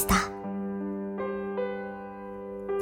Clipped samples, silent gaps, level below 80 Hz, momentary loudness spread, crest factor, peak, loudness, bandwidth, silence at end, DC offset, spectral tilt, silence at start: under 0.1%; none; -46 dBFS; 12 LU; 20 dB; -10 dBFS; -33 LUFS; 18 kHz; 0 s; under 0.1%; -4.5 dB/octave; 0 s